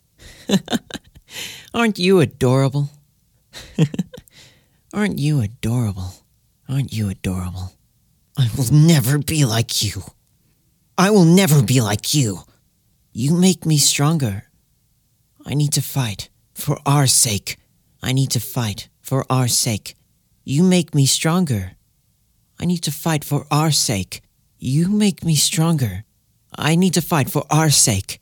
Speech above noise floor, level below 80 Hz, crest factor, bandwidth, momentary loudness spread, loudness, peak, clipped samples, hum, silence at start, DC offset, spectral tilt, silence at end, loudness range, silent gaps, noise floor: 45 dB; -50 dBFS; 18 dB; 19 kHz; 18 LU; -18 LUFS; 0 dBFS; under 0.1%; none; 0.25 s; under 0.1%; -4.5 dB/octave; 0.05 s; 7 LU; none; -62 dBFS